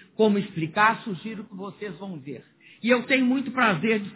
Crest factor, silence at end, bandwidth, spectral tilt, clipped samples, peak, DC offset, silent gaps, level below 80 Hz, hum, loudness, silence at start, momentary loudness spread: 18 dB; 0 s; 4 kHz; -9.5 dB/octave; under 0.1%; -6 dBFS; under 0.1%; none; -70 dBFS; none; -23 LUFS; 0.2 s; 17 LU